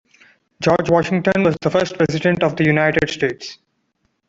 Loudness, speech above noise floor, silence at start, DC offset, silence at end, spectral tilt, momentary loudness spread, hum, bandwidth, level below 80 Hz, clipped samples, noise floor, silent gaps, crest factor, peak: -17 LUFS; 51 dB; 0.6 s; under 0.1%; 0.75 s; -6 dB/octave; 7 LU; none; 7.8 kHz; -48 dBFS; under 0.1%; -68 dBFS; none; 16 dB; -2 dBFS